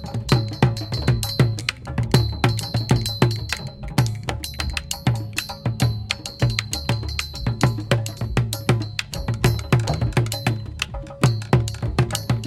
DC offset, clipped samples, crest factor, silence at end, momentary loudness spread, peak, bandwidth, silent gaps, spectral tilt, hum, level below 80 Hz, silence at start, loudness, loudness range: under 0.1%; under 0.1%; 22 dB; 0 s; 7 LU; 0 dBFS; 16 kHz; none; -5 dB/octave; none; -34 dBFS; 0 s; -23 LUFS; 3 LU